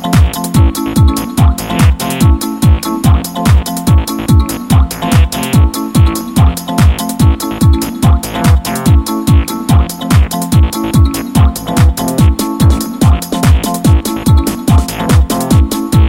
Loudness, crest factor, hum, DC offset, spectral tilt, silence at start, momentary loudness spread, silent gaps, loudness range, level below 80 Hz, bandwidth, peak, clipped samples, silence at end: -11 LUFS; 10 dB; none; under 0.1%; -6 dB/octave; 0 s; 1 LU; none; 0 LU; -14 dBFS; 17 kHz; 0 dBFS; under 0.1%; 0 s